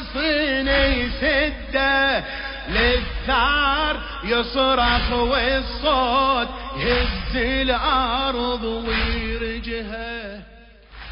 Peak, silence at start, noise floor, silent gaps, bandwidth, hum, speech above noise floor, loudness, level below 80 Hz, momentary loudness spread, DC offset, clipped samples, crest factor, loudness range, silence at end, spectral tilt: -6 dBFS; 0 s; -46 dBFS; none; 5.4 kHz; none; 25 dB; -21 LUFS; -30 dBFS; 11 LU; under 0.1%; under 0.1%; 16 dB; 3 LU; 0 s; -9 dB/octave